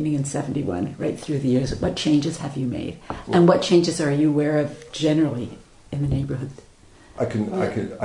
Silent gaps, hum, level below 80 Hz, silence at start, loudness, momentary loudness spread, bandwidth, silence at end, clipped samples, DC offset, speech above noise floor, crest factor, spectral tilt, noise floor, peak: none; none; -46 dBFS; 0 s; -22 LUFS; 13 LU; 11 kHz; 0 s; under 0.1%; under 0.1%; 27 dB; 20 dB; -6.5 dB/octave; -49 dBFS; -2 dBFS